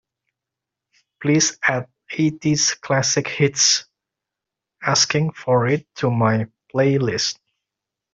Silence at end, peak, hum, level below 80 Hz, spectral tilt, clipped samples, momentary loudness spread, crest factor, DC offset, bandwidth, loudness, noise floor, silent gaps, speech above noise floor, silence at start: 0.8 s; -4 dBFS; none; -60 dBFS; -3.5 dB/octave; under 0.1%; 9 LU; 18 dB; under 0.1%; 7.8 kHz; -19 LUFS; -85 dBFS; none; 66 dB; 1.2 s